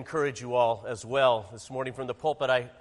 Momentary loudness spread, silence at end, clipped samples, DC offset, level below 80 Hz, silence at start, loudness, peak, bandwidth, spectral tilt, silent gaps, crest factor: 10 LU; 0.1 s; under 0.1%; under 0.1%; -64 dBFS; 0 s; -28 LUFS; -10 dBFS; 11.5 kHz; -4.5 dB/octave; none; 18 dB